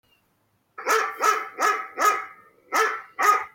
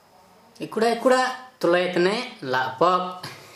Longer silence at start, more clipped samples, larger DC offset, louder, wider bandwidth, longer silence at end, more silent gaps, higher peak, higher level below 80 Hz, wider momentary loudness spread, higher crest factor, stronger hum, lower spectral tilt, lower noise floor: first, 0.8 s vs 0.6 s; neither; neither; about the same, -23 LUFS vs -23 LUFS; first, 17 kHz vs 14 kHz; about the same, 0.05 s vs 0.05 s; neither; about the same, -6 dBFS vs -6 dBFS; second, -78 dBFS vs -72 dBFS; second, 7 LU vs 12 LU; about the same, 18 dB vs 18 dB; neither; second, 0.5 dB/octave vs -4.5 dB/octave; first, -69 dBFS vs -54 dBFS